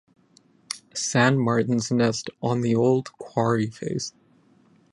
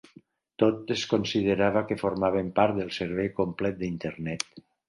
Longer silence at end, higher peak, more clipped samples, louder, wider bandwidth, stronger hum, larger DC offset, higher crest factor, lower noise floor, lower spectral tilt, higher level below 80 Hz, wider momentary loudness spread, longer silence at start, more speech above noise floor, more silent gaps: first, 0.85 s vs 0.3 s; about the same, -4 dBFS vs -6 dBFS; neither; first, -24 LUFS vs -27 LUFS; about the same, 11.5 kHz vs 11.5 kHz; neither; neither; about the same, 20 dB vs 22 dB; about the same, -59 dBFS vs -57 dBFS; about the same, -5.5 dB/octave vs -5.5 dB/octave; second, -62 dBFS vs -56 dBFS; first, 12 LU vs 8 LU; about the same, 0.7 s vs 0.6 s; first, 36 dB vs 30 dB; neither